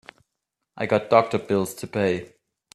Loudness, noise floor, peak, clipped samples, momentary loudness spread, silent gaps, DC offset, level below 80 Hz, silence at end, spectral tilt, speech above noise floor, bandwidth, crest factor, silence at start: -23 LUFS; -82 dBFS; -2 dBFS; under 0.1%; 10 LU; none; under 0.1%; -62 dBFS; 0.5 s; -5.5 dB/octave; 59 dB; 13.5 kHz; 22 dB; 0.75 s